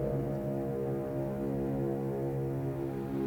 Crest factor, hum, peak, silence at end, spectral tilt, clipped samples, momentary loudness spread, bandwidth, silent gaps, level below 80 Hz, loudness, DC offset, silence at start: 12 dB; none; -22 dBFS; 0 s; -9.5 dB/octave; under 0.1%; 2 LU; 18.5 kHz; none; -52 dBFS; -34 LUFS; under 0.1%; 0 s